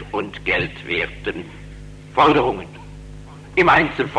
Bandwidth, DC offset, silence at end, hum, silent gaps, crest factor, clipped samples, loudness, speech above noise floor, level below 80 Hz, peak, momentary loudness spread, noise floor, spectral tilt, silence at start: 11 kHz; under 0.1%; 0 s; 50 Hz at -40 dBFS; none; 18 dB; under 0.1%; -19 LUFS; 19 dB; -40 dBFS; -4 dBFS; 25 LU; -37 dBFS; -6 dB/octave; 0 s